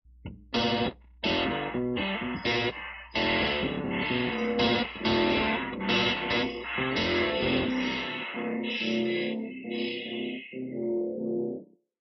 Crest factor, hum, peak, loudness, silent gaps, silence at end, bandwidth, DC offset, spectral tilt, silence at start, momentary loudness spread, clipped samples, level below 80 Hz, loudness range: 16 dB; none; -14 dBFS; -29 LUFS; none; 0.35 s; 6 kHz; under 0.1%; -2.5 dB/octave; 0.25 s; 9 LU; under 0.1%; -52 dBFS; 5 LU